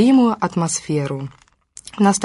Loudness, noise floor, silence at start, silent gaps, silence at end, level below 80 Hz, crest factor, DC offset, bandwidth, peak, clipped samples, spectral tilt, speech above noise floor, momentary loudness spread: -19 LUFS; -43 dBFS; 0 s; none; 0 s; -56 dBFS; 16 dB; under 0.1%; 11.5 kHz; -2 dBFS; under 0.1%; -5.5 dB/octave; 26 dB; 20 LU